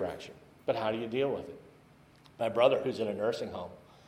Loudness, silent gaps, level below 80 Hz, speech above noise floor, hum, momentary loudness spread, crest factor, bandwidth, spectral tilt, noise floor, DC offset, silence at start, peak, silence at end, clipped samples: -32 LUFS; none; -68 dBFS; 28 dB; none; 20 LU; 24 dB; 13 kHz; -6 dB/octave; -59 dBFS; under 0.1%; 0 s; -10 dBFS; 0.25 s; under 0.1%